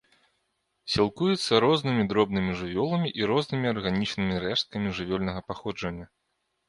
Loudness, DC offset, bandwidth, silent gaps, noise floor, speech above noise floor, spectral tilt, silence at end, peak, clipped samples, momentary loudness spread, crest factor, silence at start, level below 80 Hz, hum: -27 LUFS; under 0.1%; 11.5 kHz; none; -77 dBFS; 51 dB; -6 dB/octave; 0.65 s; -6 dBFS; under 0.1%; 11 LU; 20 dB; 0.85 s; -52 dBFS; none